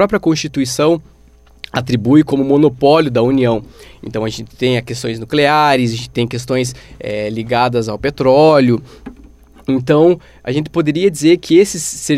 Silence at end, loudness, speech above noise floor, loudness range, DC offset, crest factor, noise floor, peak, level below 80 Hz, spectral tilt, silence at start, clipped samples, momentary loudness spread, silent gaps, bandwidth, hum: 0 s; -14 LUFS; 32 dB; 2 LU; under 0.1%; 14 dB; -45 dBFS; 0 dBFS; -44 dBFS; -5.5 dB/octave; 0 s; under 0.1%; 11 LU; none; 15.5 kHz; none